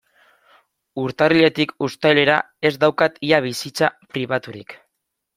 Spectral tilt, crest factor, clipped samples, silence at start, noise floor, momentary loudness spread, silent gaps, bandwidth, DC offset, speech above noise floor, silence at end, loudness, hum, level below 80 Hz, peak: -5 dB/octave; 20 dB; under 0.1%; 0.95 s; -77 dBFS; 13 LU; none; 16 kHz; under 0.1%; 58 dB; 0.6 s; -19 LUFS; none; -60 dBFS; -2 dBFS